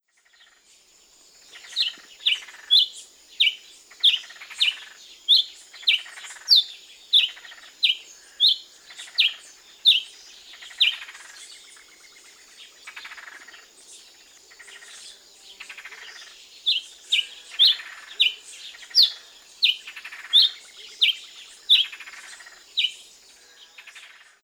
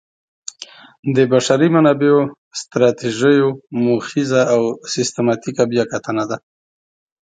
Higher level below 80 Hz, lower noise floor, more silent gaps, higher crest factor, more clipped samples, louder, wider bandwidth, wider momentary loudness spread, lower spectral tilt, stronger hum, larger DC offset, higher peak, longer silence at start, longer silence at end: second, -78 dBFS vs -62 dBFS; first, -58 dBFS vs -40 dBFS; second, none vs 0.99-1.03 s, 2.38-2.51 s; about the same, 20 dB vs 16 dB; neither; second, -20 LUFS vs -16 LUFS; first, over 20 kHz vs 9.4 kHz; first, 25 LU vs 16 LU; second, 4.5 dB/octave vs -5.5 dB/octave; neither; neither; second, -6 dBFS vs 0 dBFS; first, 1.55 s vs 0.6 s; second, 0.45 s vs 0.85 s